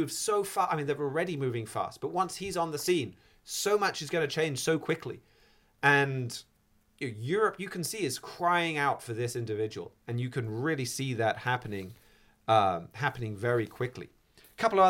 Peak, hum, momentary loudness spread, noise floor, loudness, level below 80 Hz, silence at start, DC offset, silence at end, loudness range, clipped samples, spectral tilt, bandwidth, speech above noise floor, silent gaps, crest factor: -10 dBFS; none; 12 LU; -67 dBFS; -31 LUFS; -66 dBFS; 0 s; under 0.1%; 0 s; 2 LU; under 0.1%; -4.5 dB/octave; 17 kHz; 37 dB; none; 22 dB